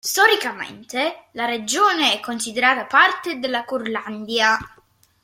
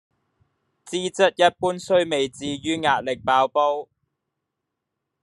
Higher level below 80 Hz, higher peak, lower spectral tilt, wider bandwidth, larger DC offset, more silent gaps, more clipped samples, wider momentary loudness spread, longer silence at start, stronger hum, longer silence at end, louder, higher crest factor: about the same, -60 dBFS vs -64 dBFS; about the same, -2 dBFS vs -2 dBFS; second, -1 dB/octave vs -4 dB/octave; first, 16.5 kHz vs 11.5 kHz; neither; neither; neither; about the same, 11 LU vs 10 LU; second, 0.05 s vs 0.85 s; neither; second, 0.55 s vs 1.4 s; first, -19 LUFS vs -22 LUFS; about the same, 20 dB vs 22 dB